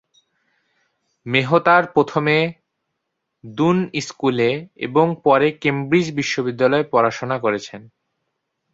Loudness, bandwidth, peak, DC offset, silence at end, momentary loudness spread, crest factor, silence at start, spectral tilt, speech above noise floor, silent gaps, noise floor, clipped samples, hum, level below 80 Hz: -18 LUFS; 8 kHz; -2 dBFS; under 0.1%; 0.9 s; 10 LU; 18 dB; 1.25 s; -6 dB/octave; 59 dB; none; -77 dBFS; under 0.1%; none; -60 dBFS